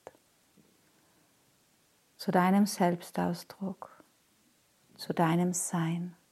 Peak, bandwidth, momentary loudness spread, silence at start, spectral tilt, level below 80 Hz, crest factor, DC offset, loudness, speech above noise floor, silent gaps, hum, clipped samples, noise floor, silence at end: -12 dBFS; 14.5 kHz; 14 LU; 2.2 s; -5.5 dB/octave; -80 dBFS; 22 dB; under 0.1%; -30 LUFS; 39 dB; none; none; under 0.1%; -68 dBFS; 0.2 s